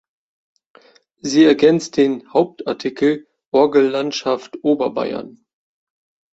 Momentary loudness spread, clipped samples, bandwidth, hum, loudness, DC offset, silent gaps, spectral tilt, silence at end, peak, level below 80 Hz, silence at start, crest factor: 11 LU; under 0.1%; 8 kHz; none; -17 LUFS; under 0.1%; 3.46-3.52 s; -5 dB/octave; 1 s; -2 dBFS; -62 dBFS; 1.25 s; 16 dB